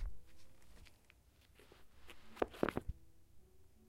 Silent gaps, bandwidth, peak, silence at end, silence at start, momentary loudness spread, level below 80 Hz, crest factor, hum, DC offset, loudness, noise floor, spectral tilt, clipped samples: none; 16 kHz; -16 dBFS; 0 s; 0 s; 26 LU; -56 dBFS; 32 dB; none; under 0.1%; -43 LUFS; -68 dBFS; -6.5 dB/octave; under 0.1%